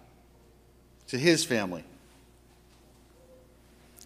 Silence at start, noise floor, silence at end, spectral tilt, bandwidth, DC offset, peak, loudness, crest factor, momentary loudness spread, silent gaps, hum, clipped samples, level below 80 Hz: 1.1 s; -59 dBFS; 0 s; -4 dB/octave; 15.5 kHz; under 0.1%; -8 dBFS; -27 LUFS; 26 dB; 18 LU; none; 60 Hz at -60 dBFS; under 0.1%; -62 dBFS